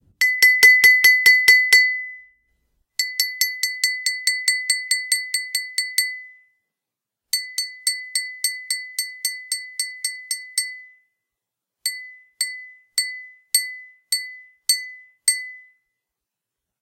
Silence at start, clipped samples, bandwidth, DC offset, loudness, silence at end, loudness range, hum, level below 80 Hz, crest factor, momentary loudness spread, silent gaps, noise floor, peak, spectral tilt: 0.2 s; under 0.1%; 17 kHz; under 0.1%; -18 LUFS; 1.2 s; 13 LU; none; -74 dBFS; 20 dB; 17 LU; none; -86 dBFS; -2 dBFS; 4.5 dB/octave